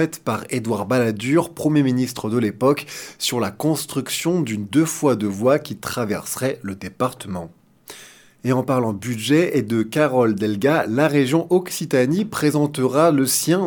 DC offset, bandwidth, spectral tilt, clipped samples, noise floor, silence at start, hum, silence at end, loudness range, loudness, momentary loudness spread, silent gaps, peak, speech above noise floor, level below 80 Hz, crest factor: under 0.1%; 19 kHz; -5 dB/octave; under 0.1%; -45 dBFS; 0 s; none; 0 s; 6 LU; -20 LUFS; 8 LU; none; -2 dBFS; 26 dB; -60 dBFS; 18 dB